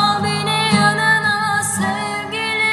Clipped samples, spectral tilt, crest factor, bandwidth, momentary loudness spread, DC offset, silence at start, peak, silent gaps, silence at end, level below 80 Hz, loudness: under 0.1%; -3 dB/octave; 16 dB; 14 kHz; 7 LU; under 0.1%; 0 s; -2 dBFS; none; 0 s; -56 dBFS; -16 LUFS